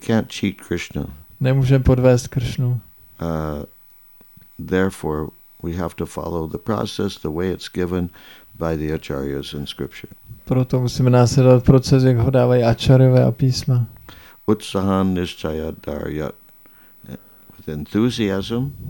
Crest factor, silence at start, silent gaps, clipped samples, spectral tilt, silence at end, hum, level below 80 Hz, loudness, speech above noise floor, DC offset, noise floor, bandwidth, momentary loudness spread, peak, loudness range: 18 dB; 0 s; none; under 0.1%; -7 dB/octave; 0 s; none; -38 dBFS; -19 LUFS; 30 dB; 0.2%; -48 dBFS; 17 kHz; 17 LU; 0 dBFS; 11 LU